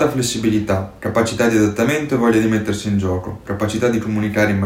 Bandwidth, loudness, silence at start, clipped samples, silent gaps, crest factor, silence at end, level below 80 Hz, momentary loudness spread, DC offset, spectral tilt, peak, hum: 16.5 kHz; -18 LUFS; 0 s; under 0.1%; none; 16 dB; 0 s; -46 dBFS; 6 LU; under 0.1%; -5.5 dB/octave; -2 dBFS; none